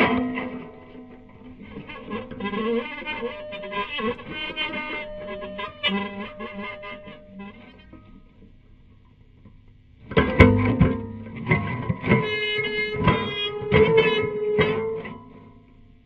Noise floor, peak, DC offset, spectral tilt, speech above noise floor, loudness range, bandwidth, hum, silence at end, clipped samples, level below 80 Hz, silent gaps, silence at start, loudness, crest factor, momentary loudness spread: -52 dBFS; 0 dBFS; under 0.1%; -8 dB/octave; 22 dB; 11 LU; 6.4 kHz; none; 0.45 s; under 0.1%; -40 dBFS; none; 0 s; -24 LUFS; 26 dB; 22 LU